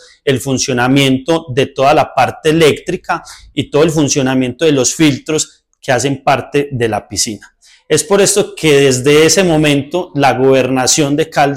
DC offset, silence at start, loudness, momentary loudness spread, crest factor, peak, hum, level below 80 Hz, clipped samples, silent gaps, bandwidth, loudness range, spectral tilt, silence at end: under 0.1%; 0.25 s; -12 LUFS; 9 LU; 10 dB; -2 dBFS; none; -44 dBFS; under 0.1%; none; 17 kHz; 4 LU; -4 dB/octave; 0 s